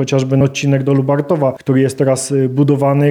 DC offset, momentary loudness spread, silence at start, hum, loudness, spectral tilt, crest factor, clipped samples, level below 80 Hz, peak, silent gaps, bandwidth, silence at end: under 0.1%; 3 LU; 0 s; none; -14 LUFS; -6.5 dB/octave; 12 dB; under 0.1%; -52 dBFS; 0 dBFS; none; 13.5 kHz; 0 s